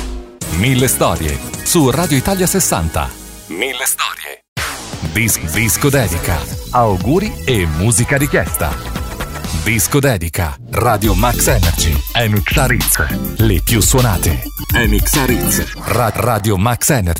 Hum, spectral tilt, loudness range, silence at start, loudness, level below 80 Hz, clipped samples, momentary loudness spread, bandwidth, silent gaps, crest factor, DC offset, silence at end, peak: none; -4 dB/octave; 3 LU; 0 s; -14 LUFS; -24 dBFS; under 0.1%; 9 LU; 16.5 kHz; 4.48-4.56 s; 14 dB; under 0.1%; 0 s; -2 dBFS